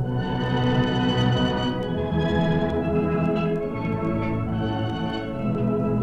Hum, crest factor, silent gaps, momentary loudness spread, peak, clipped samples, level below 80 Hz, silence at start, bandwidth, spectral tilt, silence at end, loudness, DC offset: none; 14 dB; none; 5 LU; -10 dBFS; under 0.1%; -40 dBFS; 0 s; 8 kHz; -8 dB/octave; 0 s; -24 LUFS; under 0.1%